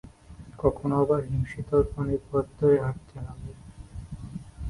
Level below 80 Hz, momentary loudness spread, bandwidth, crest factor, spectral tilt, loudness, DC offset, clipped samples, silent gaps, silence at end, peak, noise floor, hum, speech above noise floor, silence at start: -44 dBFS; 20 LU; 11.5 kHz; 20 dB; -9.5 dB/octave; -26 LUFS; under 0.1%; under 0.1%; none; 0 s; -8 dBFS; -47 dBFS; none; 21 dB; 0.05 s